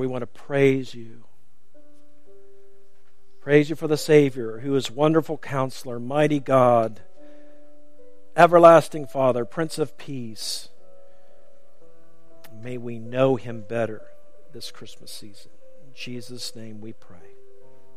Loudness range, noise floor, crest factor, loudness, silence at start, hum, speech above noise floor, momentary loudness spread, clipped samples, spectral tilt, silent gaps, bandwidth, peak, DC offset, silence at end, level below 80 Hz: 16 LU; -63 dBFS; 24 dB; -21 LUFS; 0 s; none; 41 dB; 22 LU; under 0.1%; -6 dB/octave; none; 15.5 kHz; 0 dBFS; 2%; 1.05 s; -64 dBFS